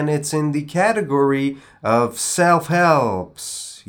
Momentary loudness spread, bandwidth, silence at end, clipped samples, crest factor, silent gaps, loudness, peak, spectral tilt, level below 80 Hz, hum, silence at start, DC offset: 11 LU; over 20 kHz; 0.1 s; under 0.1%; 18 dB; none; -19 LUFS; -2 dBFS; -5 dB/octave; -60 dBFS; none; 0 s; under 0.1%